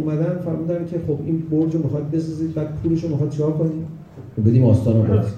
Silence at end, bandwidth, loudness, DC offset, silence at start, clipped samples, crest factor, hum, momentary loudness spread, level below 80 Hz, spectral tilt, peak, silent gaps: 0 s; 9 kHz; -20 LUFS; under 0.1%; 0 s; under 0.1%; 16 dB; none; 9 LU; -48 dBFS; -10.5 dB/octave; -4 dBFS; none